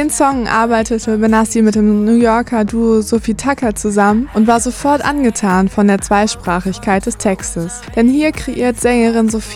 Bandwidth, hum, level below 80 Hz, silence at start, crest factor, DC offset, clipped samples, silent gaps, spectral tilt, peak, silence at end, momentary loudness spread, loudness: 14.5 kHz; none; -34 dBFS; 0 s; 14 dB; under 0.1%; under 0.1%; none; -5 dB/octave; 0 dBFS; 0 s; 6 LU; -13 LUFS